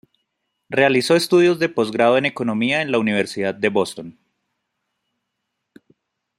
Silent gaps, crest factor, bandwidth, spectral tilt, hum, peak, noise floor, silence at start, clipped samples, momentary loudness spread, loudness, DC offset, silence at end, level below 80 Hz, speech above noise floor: none; 18 dB; 15.5 kHz; -5 dB/octave; none; -2 dBFS; -77 dBFS; 0.7 s; under 0.1%; 8 LU; -18 LUFS; under 0.1%; 2.25 s; -64 dBFS; 59 dB